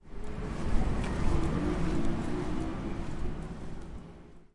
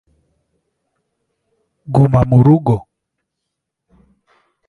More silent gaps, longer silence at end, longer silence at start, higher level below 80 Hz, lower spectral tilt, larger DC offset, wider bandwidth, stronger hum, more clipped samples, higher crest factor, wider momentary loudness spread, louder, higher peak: neither; second, 0.15 s vs 1.9 s; second, 0.05 s vs 1.9 s; first, -36 dBFS vs -42 dBFS; second, -7 dB/octave vs -11 dB/octave; neither; first, 11 kHz vs 4.3 kHz; neither; neither; about the same, 18 dB vs 18 dB; first, 13 LU vs 8 LU; second, -35 LUFS vs -13 LUFS; second, -12 dBFS vs 0 dBFS